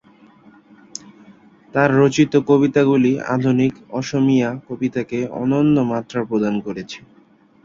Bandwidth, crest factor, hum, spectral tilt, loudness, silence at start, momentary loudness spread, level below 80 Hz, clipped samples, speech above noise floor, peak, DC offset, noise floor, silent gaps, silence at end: 7.6 kHz; 18 dB; none; -7 dB/octave; -18 LUFS; 1.3 s; 16 LU; -56 dBFS; under 0.1%; 35 dB; -2 dBFS; under 0.1%; -52 dBFS; none; 0.65 s